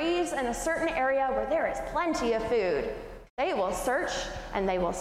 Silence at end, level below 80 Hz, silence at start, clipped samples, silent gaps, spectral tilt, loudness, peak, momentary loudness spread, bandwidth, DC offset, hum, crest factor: 0 s; -46 dBFS; 0 s; under 0.1%; 3.30-3.37 s; -4 dB/octave; -29 LUFS; -16 dBFS; 6 LU; 15.5 kHz; under 0.1%; none; 12 dB